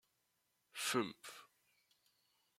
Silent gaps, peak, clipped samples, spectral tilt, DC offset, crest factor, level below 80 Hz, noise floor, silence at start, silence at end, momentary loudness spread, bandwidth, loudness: none; -22 dBFS; under 0.1%; -2.5 dB/octave; under 0.1%; 24 dB; -90 dBFS; -83 dBFS; 0.75 s; 1.15 s; 17 LU; 16.5 kHz; -40 LUFS